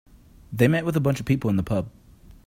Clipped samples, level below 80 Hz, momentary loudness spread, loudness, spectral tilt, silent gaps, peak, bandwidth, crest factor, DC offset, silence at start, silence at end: under 0.1%; -48 dBFS; 11 LU; -23 LUFS; -7.5 dB/octave; none; -4 dBFS; 16 kHz; 20 dB; under 0.1%; 0.5 s; 0.15 s